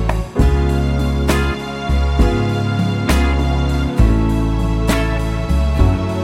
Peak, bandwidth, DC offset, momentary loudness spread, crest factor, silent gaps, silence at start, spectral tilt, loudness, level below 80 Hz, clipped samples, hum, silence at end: 0 dBFS; 16 kHz; under 0.1%; 4 LU; 14 dB; none; 0 s; -6.5 dB/octave; -17 LUFS; -18 dBFS; under 0.1%; none; 0 s